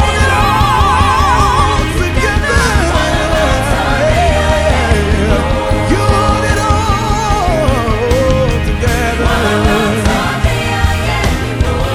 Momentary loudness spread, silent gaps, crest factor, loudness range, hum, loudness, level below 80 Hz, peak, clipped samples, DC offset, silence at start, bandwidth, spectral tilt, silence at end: 4 LU; none; 12 dB; 2 LU; none; -12 LUFS; -18 dBFS; 0 dBFS; under 0.1%; under 0.1%; 0 s; 15.5 kHz; -5 dB/octave; 0 s